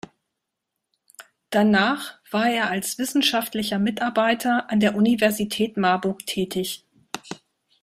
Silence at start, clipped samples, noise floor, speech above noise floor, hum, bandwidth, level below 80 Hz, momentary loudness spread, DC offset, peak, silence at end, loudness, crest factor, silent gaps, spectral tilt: 1.2 s; under 0.1%; -82 dBFS; 60 dB; none; 16 kHz; -62 dBFS; 15 LU; under 0.1%; -4 dBFS; 0.45 s; -22 LUFS; 18 dB; none; -4 dB/octave